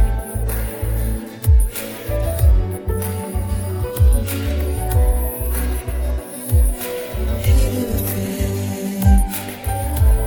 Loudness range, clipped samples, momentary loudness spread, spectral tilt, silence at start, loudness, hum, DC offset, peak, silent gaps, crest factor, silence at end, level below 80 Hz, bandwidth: 1 LU; under 0.1%; 8 LU; -6 dB/octave; 0 s; -20 LUFS; none; under 0.1%; -2 dBFS; none; 16 dB; 0 s; -20 dBFS; 19.5 kHz